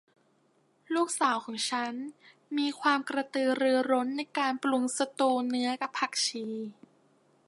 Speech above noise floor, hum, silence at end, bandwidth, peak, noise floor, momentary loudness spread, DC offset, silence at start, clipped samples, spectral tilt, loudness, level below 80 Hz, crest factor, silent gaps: 39 dB; none; 0.75 s; 11.5 kHz; -12 dBFS; -69 dBFS; 9 LU; under 0.1%; 0.9 s; under 0.1%; -2 dB/octave; -30 LUFS; -86 dBFS; 18 dB; none